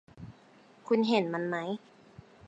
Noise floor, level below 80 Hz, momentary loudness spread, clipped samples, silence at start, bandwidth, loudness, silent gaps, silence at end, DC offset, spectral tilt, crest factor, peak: -59 dBFS; -70 dBFS; 24 LU; under 0.1%; 0.15 s; 8.2 kHz; -30 LUFS; none; 0 s; under 0.1%; -6.5 dB/octave; 20 dB; -14 dBFS